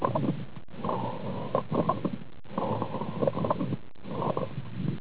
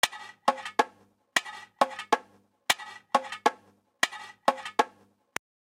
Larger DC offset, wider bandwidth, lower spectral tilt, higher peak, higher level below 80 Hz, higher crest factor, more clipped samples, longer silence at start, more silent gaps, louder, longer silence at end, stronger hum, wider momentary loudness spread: first, 1% vs under 0.1%; second, 4 kHz vs 16.5 kHz; first, -7.5 dB/octave vs -1 dB/octave; second, -12 dBFS vs -8 dBFS; first, -56 dBFS vs -74 dBFS; about the same, 18 dB vs 22 dB; neither; about the same, 0 s vs 0.05 s; neither; second, -32 LUFS vs -29 LUFS; second, 0 s vs 0.85 s; neither; about the same, 10 LU vs 12 LU